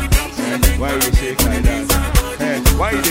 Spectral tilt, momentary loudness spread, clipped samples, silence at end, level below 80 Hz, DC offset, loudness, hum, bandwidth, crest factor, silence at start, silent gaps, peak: -4 dB/octave; 3 LU; under 0.1%; 0 s; -18 dBFS; under 0.1%; -17 LUFS; none; 16.5 kHz; 16 dB; 0 s; none; 0 dBFS